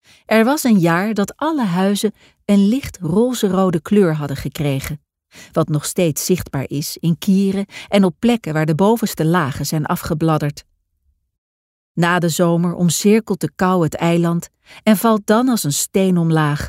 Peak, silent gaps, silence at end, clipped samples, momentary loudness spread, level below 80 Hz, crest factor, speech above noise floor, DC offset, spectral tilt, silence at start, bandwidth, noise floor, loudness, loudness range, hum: -2 dBFS; 11.38-11.95 s; 0 s; under 0.1%; 9 LU; -46 dBFS; 14 dB; 48 dB; under 0.1%; -5.5 dB/octave; 0.3 s; 16 kHz; -65 dBFS; -17 LUFS; 3 LU; none